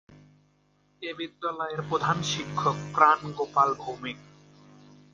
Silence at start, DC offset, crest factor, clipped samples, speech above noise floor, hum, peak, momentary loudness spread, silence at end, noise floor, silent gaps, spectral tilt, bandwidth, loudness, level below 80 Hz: 0.1 s; under 0.1%; 24 dB; under 0.1%; 39 dB; 50 Hz at -45 dBFS; -6 dBFS; 16 LU; 0.9 s; -66 dBFS; none; -4.5 dB/octave; 9.6 kHz; -27 LUFS; -64 dBFS